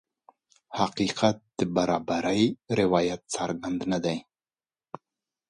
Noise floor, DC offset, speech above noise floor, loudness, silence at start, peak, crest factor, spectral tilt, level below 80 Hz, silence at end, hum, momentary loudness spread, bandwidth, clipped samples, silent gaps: under -90 dBFS; under 0.1%; over 64 dB; -27 LUFS; 0.7 s; -8 dBFS; 20 dB; -5 dB/octave; -60 dBFS; 1.3 s; none; 14 LU; 11.5 kHz; under 0.1%; none